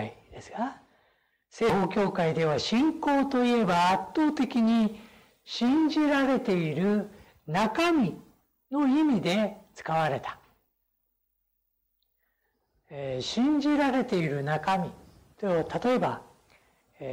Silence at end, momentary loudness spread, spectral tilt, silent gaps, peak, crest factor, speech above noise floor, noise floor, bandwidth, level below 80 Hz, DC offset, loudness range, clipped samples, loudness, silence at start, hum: 0 s; 14 LU; -6 dB/octave; none; -18 dBFS; 10 dB; 52 dB; -78 dBFS; 16 kHz; -62 dBFS; under 0.1%; 8 LU; under 0.1%; -27 LUFS; 0 s; none